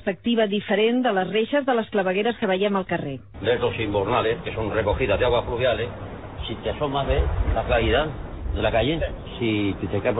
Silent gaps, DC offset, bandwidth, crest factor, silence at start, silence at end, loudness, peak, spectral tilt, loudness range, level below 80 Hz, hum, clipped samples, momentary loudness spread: none; 0.2%; 4 kHz; 16 dB; 0 s; 0 s; -23 LUFS; -6 dBFS; -10 dB/octave; 2 LU; -34 dBFS; none; under 0.1%; 9 LU